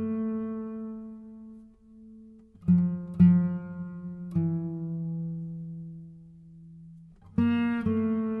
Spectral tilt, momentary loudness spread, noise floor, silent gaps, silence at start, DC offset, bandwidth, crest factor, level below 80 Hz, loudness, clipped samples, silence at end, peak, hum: -11 dB/octave; 24 LU; -52 dBFS; none; 0 s; under 0.1%; 3.7 kHz; 20 dB; -58 dBFS; -28 LUFS; under 0.1%; 0 s; -10 dBFS; none